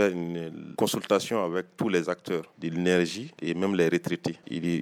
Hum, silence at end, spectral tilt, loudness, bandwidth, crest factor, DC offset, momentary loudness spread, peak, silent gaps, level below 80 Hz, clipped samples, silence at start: none; 0 s; -5.5 dB/octave; -28 LUFS; 18.5 kHz; 18 dB; under 0.1%; 9 LU; -8 dBFS; none; -68 dBFS; under 0.1%; 0 s